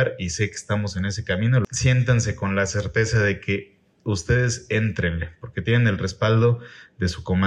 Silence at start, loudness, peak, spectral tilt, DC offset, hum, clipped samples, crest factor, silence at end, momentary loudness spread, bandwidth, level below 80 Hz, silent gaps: 0 s; -23 LUFS; -6 dBFS; -5.5 dB/octave; under 0.1%; none; under 0.1%; 16 dB; 0 s; 8 LU; 10.5 kHz; -42 dBFS; none